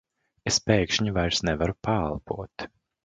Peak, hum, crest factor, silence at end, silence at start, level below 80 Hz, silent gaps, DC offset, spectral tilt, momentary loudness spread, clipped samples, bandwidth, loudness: -6 dBFS; none; 22 dB; 0.4 s; 0.45 s; -42 dBFS; none; under 0.1%; -4 dB/octave; 14 LU; under 0.1%; 9.4 kHz; -26 LUFS